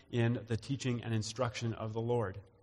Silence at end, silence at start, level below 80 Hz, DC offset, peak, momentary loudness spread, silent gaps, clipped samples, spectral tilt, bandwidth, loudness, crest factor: 0.2 s; 0.1 s; -64 dBFS; under 0.1%; -20 dBFS; 5 LU; none; under 0.1%; -6 dB/octave; 11.5 kHz; -36 LUFS; 16 dB